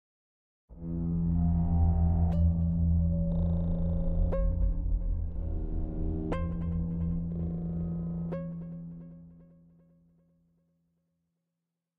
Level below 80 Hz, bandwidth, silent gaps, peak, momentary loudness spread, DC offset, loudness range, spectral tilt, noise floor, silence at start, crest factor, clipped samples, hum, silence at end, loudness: -34 dBFS; 3.3 kHz; none; -16 dBFS; 12 LU; under 0.1%; 12 LU; -12 dB/octave; -86 dBFS; 0.7 s; 14 dB; under 0.1%; none; 2.55 s; -31 LUFS